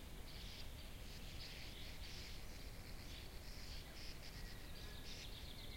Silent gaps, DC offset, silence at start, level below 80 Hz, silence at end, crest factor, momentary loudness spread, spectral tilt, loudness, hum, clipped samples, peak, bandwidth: none; under 0.1%; 0 s; -54 dBFS; 0 s; 14 dB; 3 LU; -3.5 dB/octave; -54 LUFS; none; under 0.1%; -36 dBFS; 16.5 kHz